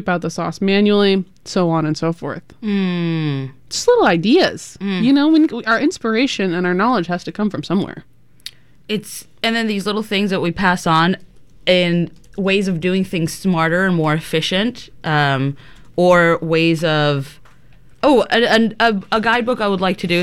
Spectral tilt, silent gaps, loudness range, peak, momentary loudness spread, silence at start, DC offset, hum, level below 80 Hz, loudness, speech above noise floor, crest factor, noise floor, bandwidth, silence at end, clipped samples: -5.5 dB/octave; none; 5 LU; -2 dBFS; 11 LU; 0 s; 0.7%; none; -48 dBFS; -17 LUFS; 32 dB; 16 dB; -48 dBFS; 15 kHz; 0 s; under 0.1%